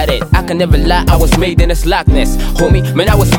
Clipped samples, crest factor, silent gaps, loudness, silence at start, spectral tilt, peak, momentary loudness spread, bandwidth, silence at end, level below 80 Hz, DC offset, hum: under 0.1%; 10 dB; none; -12 LUFS; 0 s; -5.5 dB/octave; 0 dBFS; 3 LU; 19.5 kHz; 0 s; -14 dBFS; under 0.1%; none